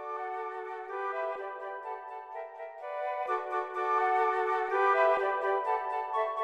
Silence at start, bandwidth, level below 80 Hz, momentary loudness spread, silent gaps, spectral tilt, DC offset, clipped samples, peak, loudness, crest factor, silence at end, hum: 0 s; 9.2 kHz; -82 dBFS; 15 LU; none; -3 dB/octave; under 0.1%; under 0.1%; -14 dBFS; -31 LUFS; 18 dB; 0 s; none